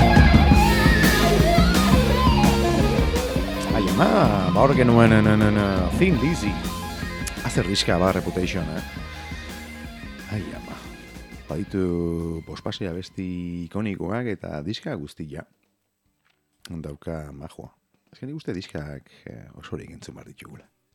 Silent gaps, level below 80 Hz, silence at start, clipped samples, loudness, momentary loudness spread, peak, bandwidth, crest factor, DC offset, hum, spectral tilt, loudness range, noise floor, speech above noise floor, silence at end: none; -30 dBFS; 0 s; under 0.1%; -21 LUFS; 22 LU; -2 dBFS; over 20 kHz; 20 dB; under 0.1%; none; -6 dB/octave; 18 LU; -72 dBFS; 48 dB; 0.4 s